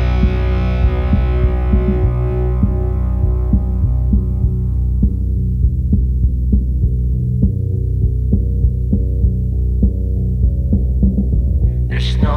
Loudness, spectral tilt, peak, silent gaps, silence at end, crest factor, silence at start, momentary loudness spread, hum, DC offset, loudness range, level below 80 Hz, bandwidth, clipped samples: -17 LUFS; -9.5 dB/octave; -2 dBFS; none; 0 s; 12 dB; 0 s; 2 LU; none; under 0.1%; 1 LU; -16 dBFS; 4.5 kHz; under 0.1%